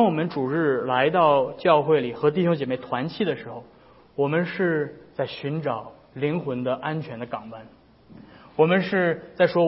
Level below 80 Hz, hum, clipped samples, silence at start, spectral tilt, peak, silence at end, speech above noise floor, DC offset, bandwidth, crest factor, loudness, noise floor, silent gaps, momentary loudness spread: -64 dBFS; none; under 0.1%; 0 s; -11 dB/octave; -4 dBFS; 0 s; 26 dB; under 0.1%; 5.8 kHz; 18 dB; -24 LUFS; -49 dBFS; none; 14 LU